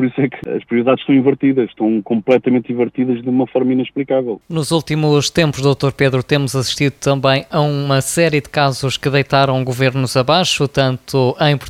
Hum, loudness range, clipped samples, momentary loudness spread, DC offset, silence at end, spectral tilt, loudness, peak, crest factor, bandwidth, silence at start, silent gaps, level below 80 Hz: none; 1 LU; under 0.1%; 5 LU; under 0.1%; 0 s; -5.5 dB/octave; -16 LUFS; 0 dBFS; 14 dB; 15.5 kHz; 0 s; none; -48 dBFS